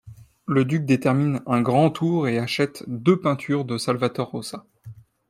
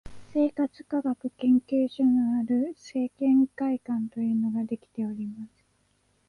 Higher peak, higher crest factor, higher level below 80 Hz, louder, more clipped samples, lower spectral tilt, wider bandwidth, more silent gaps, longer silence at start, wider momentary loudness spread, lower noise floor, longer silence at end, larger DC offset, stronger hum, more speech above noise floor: first, -4 dBFS vs -14 dBFS; about the same, 18 dB vs 14 dB; about the same, -62 dBFS vs -62 dBFS; first, -22 LUFS vs -27 LUFS; neither; about the same, -7 dB/octave vs -8 dB/octave; first, 15 kHz vs 7 kHz; neither; about the same, 0.05 s vs 0.05 s; about the same, 10 LU vs 10 LU; second, -44 dBFS vs -69 dBFS; second, 0.35 s vs 0.8 s; neither; neither; second, 23 dB vs 43 dB